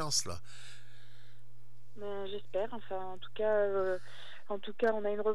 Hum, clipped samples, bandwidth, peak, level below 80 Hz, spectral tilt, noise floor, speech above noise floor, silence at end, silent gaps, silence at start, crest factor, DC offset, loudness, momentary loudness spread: 60 Hz at -60 dBFS; under 0.1%; 14.5 kHz; -18 dBFS; -70 dBFS; -3 dB/octave; -62 dBFS; 27 dB; 0 s; none; 0 s; 18 dB; 2%; -36 LUFS; 20 LU